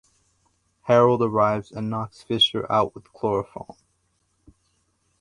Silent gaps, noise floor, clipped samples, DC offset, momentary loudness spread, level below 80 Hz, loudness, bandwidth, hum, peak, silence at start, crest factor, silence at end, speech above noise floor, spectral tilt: none; -70 dBFS; under 0.1%; under 0.1%; 19 LU; -58 dBFS; -22 LUFS; 11 kHz; none; -4 dBFS; 0.85 s; 20 dB; 1.55 s; 47 dB; -6 dB/octave